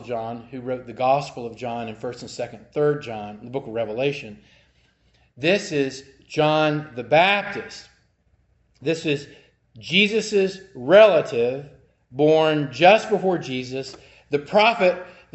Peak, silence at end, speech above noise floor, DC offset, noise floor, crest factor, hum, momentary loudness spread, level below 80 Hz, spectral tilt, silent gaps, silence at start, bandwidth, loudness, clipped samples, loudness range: 0 dBFS; 0.25 s; 42 dB; under 0.1%; -63 dBFS; 22 dB; none; 17 LU; -62 dBFS; -5 dB/octave; none; 0 s; 8.4 kHz; -21 LUFS; under 0.1%; 9 LU